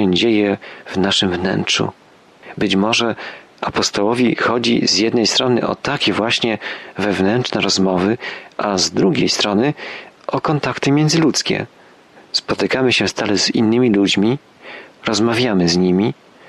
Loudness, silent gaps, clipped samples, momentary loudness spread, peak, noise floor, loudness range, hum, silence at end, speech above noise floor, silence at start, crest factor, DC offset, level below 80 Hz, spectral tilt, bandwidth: -16 LUFS; none; under 0.1%; 11 LU; -4 dBFS; -45 dBFS; 2 LU; none; 0.35 s; 29 dB; 0 s; 14 dB; under 0.1%; -52 dBFS; -4 dB/octave; 12.5 kHz